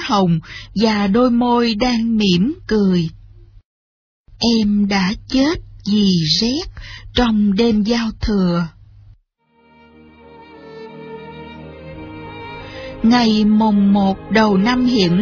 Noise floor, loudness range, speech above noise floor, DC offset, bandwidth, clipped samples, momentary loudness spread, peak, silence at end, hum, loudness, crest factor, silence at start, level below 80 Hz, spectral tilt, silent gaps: -58 dBFS; 18 LU; 42 dB; under 0.1%; 7 kHz; under 0.1%; 20 LU; -2 dBFS; 0 s; none; -16 LUFS; 16 dB; 0 s; -38 dBFS; -5 dB/octave; 3.65-4.25 s